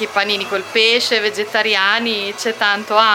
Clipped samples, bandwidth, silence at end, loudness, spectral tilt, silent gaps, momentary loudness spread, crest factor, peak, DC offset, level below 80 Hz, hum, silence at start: under 0.1%; 16.5 kHz; 0 s; -15 LUFS; -1.5 dB/octave; none; 6 LU; 16 dB; 0 dBFS; under 0.1%; -72 dBFS; none; 0 s